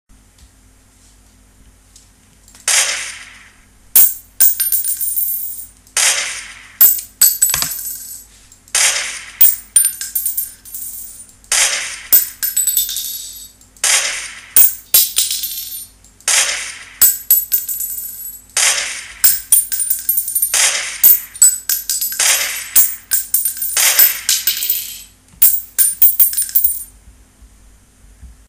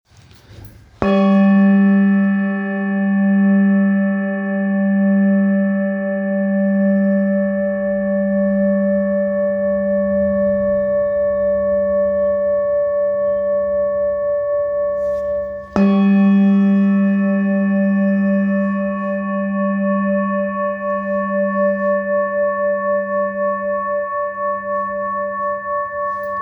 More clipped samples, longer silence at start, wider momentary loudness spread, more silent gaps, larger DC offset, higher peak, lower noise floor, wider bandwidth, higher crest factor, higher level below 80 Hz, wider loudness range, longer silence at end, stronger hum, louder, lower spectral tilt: first, 0.1% vs under 0.1%; first, 2.65 s vs 0.5 s; first, 17 LU vs 8 LU; neither; neither; about the same, 0 dBFS vs 0 dBFS; about the same, -48 dBFS vs -45 dBFS; first, over 20 kHz vs 3.5 kHz; about the same, 16 dB vs 16 dB; about the same, -50 dBFS vs -48 dBFS; about the same, 4 LU vs 4 LU; first, 0.15 s vs 0 s; neither; first, -12 LUFS vs -17 LUFS; second, 2.5 dB/octave vs -10.5 dB/octave